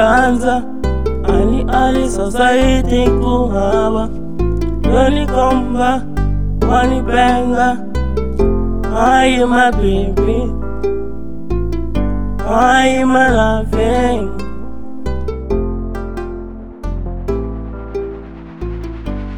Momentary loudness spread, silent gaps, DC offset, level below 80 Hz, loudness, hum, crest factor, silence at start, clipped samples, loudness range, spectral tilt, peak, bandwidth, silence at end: 14 LU; none; 7%; -22 dBFS; -15 LUFS; none; 14 dB; 0 s; under 0.1%; 9 LU; -6 dB/octave; 0 dBFS; 14 kHz; 0 s